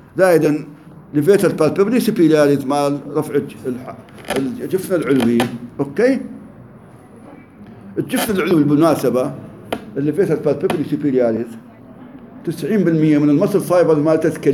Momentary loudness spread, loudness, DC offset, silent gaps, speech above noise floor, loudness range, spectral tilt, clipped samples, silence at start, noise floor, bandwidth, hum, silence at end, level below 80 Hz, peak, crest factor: 14 LU; -17 LUFS; under 0.1%; none; 25 dB; 4 LU; -6.5 dB/octave; under 0.1%; 0.15 s; -41 dBFS; 16.5 kHz; none; 0 s; -56 dBFS; -2 dBFS; 16 dB